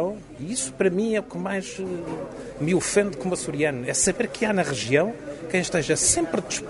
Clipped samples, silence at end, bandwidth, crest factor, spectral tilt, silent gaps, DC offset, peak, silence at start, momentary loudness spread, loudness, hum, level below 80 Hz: under 0.1%; 0 s; 11.5 kHz; 20 dB; -3.5 dB/octave; none; under 0.1%; -6 dBFS; 0 s; 11 LU; -24 LUFS; none; -50 dBFS